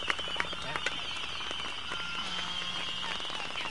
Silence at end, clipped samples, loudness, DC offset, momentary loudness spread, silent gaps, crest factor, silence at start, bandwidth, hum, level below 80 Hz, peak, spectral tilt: 0 s; under 0.1%; -34 LUFS; 0.8%; 2 LU; none; 26 dB; 0 s; 11.5 kHz; none; -58 dBFS; -10 dBFS; -1.5 dB/octave